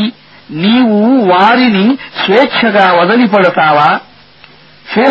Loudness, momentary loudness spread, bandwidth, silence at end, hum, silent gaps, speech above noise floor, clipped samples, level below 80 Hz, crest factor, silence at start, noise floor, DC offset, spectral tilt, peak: -9 LUFS; 8 LU; 7 kHz; 0 s; none; none; 32 dB; 0.3%; -54 dBFS; 10 dB; 0 s; -40 dBFS; under 0.1%; -7.5 dB/octave; 0 dBFS